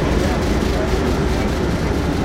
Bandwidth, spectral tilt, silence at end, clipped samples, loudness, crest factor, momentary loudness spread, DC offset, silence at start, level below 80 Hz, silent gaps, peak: 16 kHz; -6 dB/octave; 0 s; under 0.1%; -19 LUFS; 14 dB; 1 LU; under 0.1%; 0 s; -24 dBFS; none; -4 dBFS